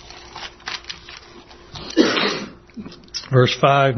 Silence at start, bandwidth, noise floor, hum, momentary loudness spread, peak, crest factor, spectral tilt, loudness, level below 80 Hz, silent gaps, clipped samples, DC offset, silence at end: 0.05 s; 6.4 kHz; -43 dBFS; none; 22 LU; 0 dBFS; 20 dB; -5.5 dB/octave; -19 LUFS; -52 dBFS; none; under 0.1%; under 0.1%; 0 s